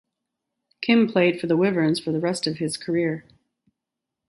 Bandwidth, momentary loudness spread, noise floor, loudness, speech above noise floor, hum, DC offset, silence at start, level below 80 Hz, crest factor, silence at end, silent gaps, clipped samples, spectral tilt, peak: 11.5 kHz; 9 LU; -85 dBFS; -22 LUFS; 63 dB; none; under 0.1%; 0.8 s; -68 dBFS; 18 dB; 1.1 s; none; under 0.1%; -5.5 dB/octave; -6 dBFS